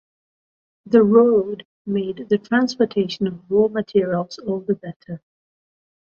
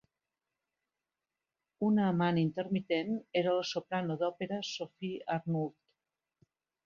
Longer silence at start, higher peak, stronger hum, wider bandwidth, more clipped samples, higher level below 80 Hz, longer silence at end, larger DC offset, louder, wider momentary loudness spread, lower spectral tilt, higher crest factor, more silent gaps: second, 0.85 s vs 1.8 s; first, -2 dBFS vs -16 dBFS; neither; about the same, 7 kHz vs 7.4 kHz; neither; first, -62 dBFS vs -76 dBFS; second, 0.95 s vs 1.15 s; neither; first, -20 LUFS vs -34 LUFS; first, 17 LU vs 10 LU; about the same, -7 dB/octave vs -6.5 dB/octave; about the same, 18 dB vs 18 dB; first, 1.65-1.85 s, 4.96-5.00 s vs none